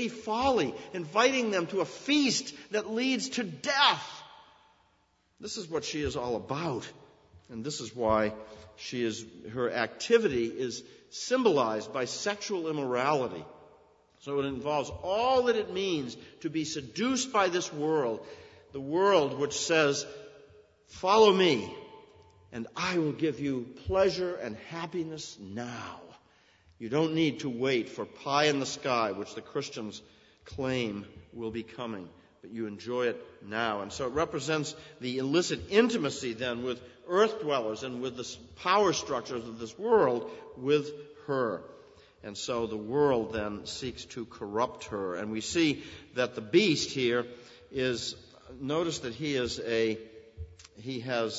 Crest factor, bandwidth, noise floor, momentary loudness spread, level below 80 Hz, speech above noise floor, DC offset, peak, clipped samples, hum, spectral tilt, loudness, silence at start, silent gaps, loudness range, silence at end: 24 dB; 8 kHz; -70 dBFS; 16 LU; -60 dBFS; 40 dB; under 0.1%; -8 dBFS; under 0.1%; none; -4 dB/octave; -30 LUFS; 0 s; none; 6 LU; 0 s